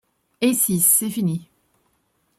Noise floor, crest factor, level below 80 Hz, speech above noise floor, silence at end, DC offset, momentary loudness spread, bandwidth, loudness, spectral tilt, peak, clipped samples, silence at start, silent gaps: -67 dBFS; 20 dB; -62 dBFS; 48 dB; 0.95 s; under 0.1%; 10 LU; 16 kHz; -18 LUFS; -4 dB/octave; -4 dBFS; under 0.1%; 0.4 s; none